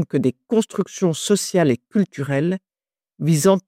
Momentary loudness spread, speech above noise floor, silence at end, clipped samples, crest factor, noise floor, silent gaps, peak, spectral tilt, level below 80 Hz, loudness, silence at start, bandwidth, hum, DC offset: 7 LU; over 71 dB; 0.1 s; under 0.1%; 16 dB; under -90 dBFS; none; -4 dBFS; -5.5 dB/octave; -64 dBFS; -21 LUFS; 0 s; 16.5 kHz; none; under 0.1%